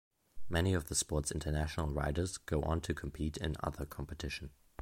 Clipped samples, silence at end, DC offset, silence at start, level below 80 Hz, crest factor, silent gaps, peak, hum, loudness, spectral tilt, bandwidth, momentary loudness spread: under 0.1%; 0.05 s; under 0.1%; 0.35 s; -44 dBFS; 18 dB; none; -20 dBFS; none; -37 LUFS; -4.5 dB/octave; 16.5 kHz; 9 LU